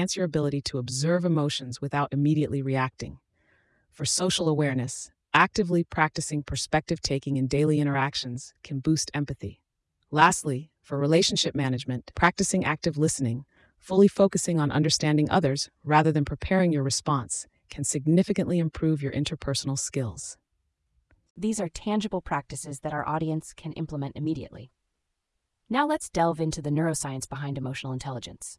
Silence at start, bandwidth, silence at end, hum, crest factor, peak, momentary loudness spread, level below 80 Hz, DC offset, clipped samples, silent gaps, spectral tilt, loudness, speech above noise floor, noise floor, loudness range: 0 s; 12 kHz; 0.05 s; none; 22 dB; -6 dBFS; 12 LU; -52 dBFS; under 0.1%; under 0.1%; 21.30-21.35 s; -5 dB/octave; -26 LUFS; 54 dB; -80 dBFS; 7 LU